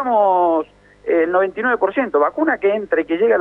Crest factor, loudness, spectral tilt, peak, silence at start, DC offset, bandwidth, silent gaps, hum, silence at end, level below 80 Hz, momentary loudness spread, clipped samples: 12 dB; -17 LUFS; -7.5 dB/octave; -4 dBFS; 0 s; under 0.1%; 4 kHz; none; 50 Hz at -55 dBFS; 0 s; -58 dBFS; 5 LU; under 0.1%